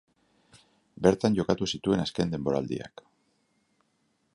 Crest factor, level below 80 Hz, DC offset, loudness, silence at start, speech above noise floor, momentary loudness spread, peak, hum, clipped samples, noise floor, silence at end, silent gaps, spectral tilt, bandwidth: 24 dB; -56 dBFS; under 0.1%; -28 LUFS; 1 s; 46 dB; 11 LU; -6 dBFS; none; under 0.1%; -73 dBFS; 1.45 s; none; -6 dB/octave; 11 kHz